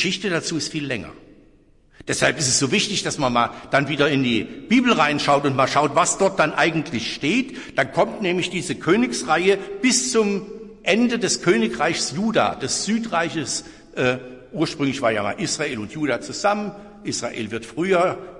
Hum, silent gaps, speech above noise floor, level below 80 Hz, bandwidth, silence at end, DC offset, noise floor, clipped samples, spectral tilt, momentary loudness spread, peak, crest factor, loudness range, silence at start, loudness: none; none; 32 dB; -54 dBFS; 11.5 kHz; 0 s; under 0.1%; -54 dBFS; under 0.1%; -3.5 dB/octave; 9 LU; -4 dBFS; 18 dB; 5 LU; 0 s; -21 LUFS